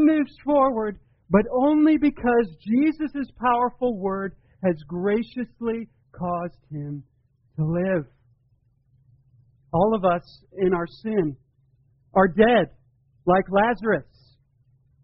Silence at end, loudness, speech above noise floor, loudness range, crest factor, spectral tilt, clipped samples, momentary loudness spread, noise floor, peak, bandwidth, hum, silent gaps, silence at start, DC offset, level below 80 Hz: 1 s; -23 LUFS; 42 dB; 8 LU; 20 dB; -6 dB/octave; under 0.1%; 14 LU; -64 dBFS; -4 dBFS; 5.6 kHz; none; none; 0 s; under 0.1%; -50 dBFS